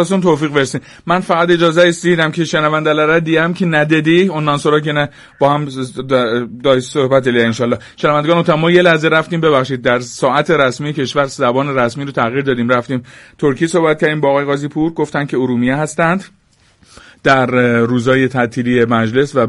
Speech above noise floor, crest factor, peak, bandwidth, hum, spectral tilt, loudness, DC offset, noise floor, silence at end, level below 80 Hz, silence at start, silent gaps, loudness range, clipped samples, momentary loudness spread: 37 dB; 14 dB; 0 dBFS; 11.5 kHz; none; -6 dB/octave; -14 LUFS; under 0.1%; -51 dBFS; 0 s; -50 dBFS; 0 s; none; 3 LU; under 0.1%; 6 LU